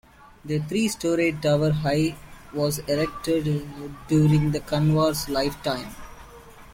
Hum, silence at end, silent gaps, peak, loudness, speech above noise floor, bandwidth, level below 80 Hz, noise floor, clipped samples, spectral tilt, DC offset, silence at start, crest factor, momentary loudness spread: none; 0 s; none; -10 dBFS; -24 LUFS; 22 dB; 16.5 kHz; -46 dBFS; -45 dBFS; under 0.1%; -6 dB/octave; under 0.1%; 0.45 s; 16 dB; 17 LU